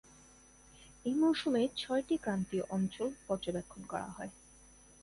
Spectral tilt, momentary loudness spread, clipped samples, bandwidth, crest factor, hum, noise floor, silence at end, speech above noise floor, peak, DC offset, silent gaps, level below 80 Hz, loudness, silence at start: -5.5 dB/octave; 12 LU; under 0.1%; 11.5 kHz; 16 dB; none; -60 dBFS; 0.7 s; 26 dB; -20 dBFS; under 0.1%; none; -64 dBFS; -35 LUFS; 0.8 s